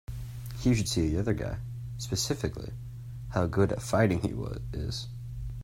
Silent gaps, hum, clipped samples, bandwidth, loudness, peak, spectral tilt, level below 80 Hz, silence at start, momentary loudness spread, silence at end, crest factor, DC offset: none; none; under 0.1%; 16 kHz; -31 LUFS; -10 dBFS; -5.5 dB/octave; -44 dBFS; 0.1 s; 14 LU; 0 s; 20 dB; under 0.1%